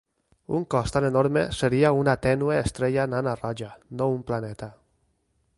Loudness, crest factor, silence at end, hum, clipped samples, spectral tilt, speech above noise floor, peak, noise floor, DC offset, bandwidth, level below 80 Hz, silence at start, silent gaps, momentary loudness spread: -25 LUFS; 18 dB; 0.85 s; none; under 0.1%; -6.5 dB/octave; 46 dB; -6 dBFS; -70 dBFS; under 0.1%; 11.5 kHz; -48 dBFS; 0.5 s; none; 14 LU